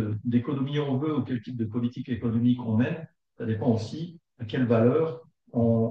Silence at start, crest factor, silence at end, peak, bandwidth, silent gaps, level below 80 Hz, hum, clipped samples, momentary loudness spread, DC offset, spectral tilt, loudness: 0 s; 18 dB; 0 s; -10 dBFS; 7.2 kHz; none; -68 dBFS; none; under 0.1%; 13 LU; under 0.1%; -9 dB/octave; -27 LUFS